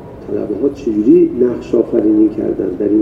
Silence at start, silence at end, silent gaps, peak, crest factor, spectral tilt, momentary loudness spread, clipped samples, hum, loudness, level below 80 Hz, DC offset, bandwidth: 0 s; 0 s; none; 0 dBFS; 14 dB; -9.5 dB/octave; 9 LU; under 0.1%; none; -14 LUFS; -42 dBFS; under 0.1%; 6.4 kHz